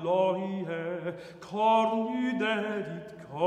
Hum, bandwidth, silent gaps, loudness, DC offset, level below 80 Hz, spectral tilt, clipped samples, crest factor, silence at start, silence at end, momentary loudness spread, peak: none; 9.6 kHz; none; -29 LUFS; under 0.1%; -72 dBFS; -6.5 dB/octave; under 0.1%; 16 dB; 0 s; 0 s; 14 LU; -12 dBFS